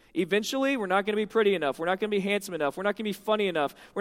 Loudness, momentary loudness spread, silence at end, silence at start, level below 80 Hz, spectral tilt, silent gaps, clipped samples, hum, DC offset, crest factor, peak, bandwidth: -27 LUFS; 5 LU; 0 s; 0.15 s; -66 dBFS; -4.5 dB/octave; none; under 0.1%; none; under 0.1%; 18 dB; -10 dBFS; 16.5 kHz